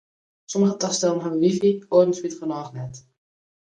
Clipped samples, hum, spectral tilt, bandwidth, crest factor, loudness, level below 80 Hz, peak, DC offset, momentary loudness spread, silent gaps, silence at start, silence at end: under 0.1%; none; -5.5 dB/octave; 10 kHz; 18 dB; -22 LUFS; -66 dBFS; -4 dBFS; under 0.1%; 13 LU; none; 0.5 s; 0.8 s